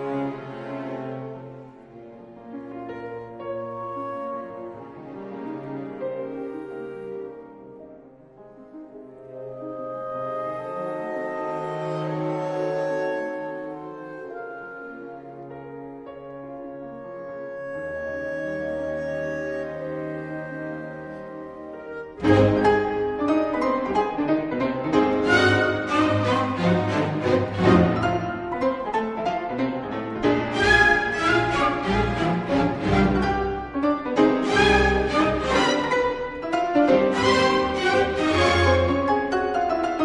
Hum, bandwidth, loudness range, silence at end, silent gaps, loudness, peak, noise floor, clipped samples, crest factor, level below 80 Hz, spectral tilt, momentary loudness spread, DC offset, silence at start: none; 10.5 kHz; 15 LU; 0 s; none; -23 LUFS; -4 dBFS; -47 dBFS; under 0.1%; 20 dB; -42 dBFS; -6 dB/octave; 19 LU; under 0.1%; 0 s